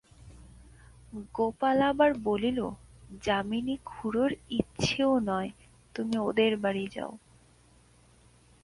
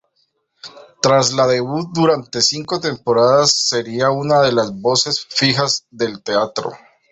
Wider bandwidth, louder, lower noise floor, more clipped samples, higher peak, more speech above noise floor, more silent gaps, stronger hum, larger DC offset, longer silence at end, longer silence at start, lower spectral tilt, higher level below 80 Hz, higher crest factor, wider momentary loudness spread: first, 11.5 kHz vs 8.4 kHz; second, -29 LUFS vs -16 LUFS; second, -60 dBFS vs -66 dBFS; neither; second, -10 dBFS vs -2 dBFS; second, 31 dB vs 49 dB; neither; neither; neither; first, 1.45 s vs 0.35 s; second, 0.2 s vs 0.65 s; first, -5.5 dB/octave vs -3.5 dB/octave; about the same, -56 dBFS vs -56 dBFS; first, 22 dB vs 16 dB; first, 14 LU vs 8 LU